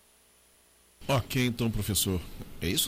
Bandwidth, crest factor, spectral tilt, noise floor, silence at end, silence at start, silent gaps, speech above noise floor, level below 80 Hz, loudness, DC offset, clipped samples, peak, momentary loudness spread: 16.5 kHz; 18 dB; -4 dB/octave; -62 dBFS; 0 s; 1 s; none; 33 dB; -46 dBFS; -29 LUFS; under 0.1%; under 0.1%; -14 dBFS; 11 LU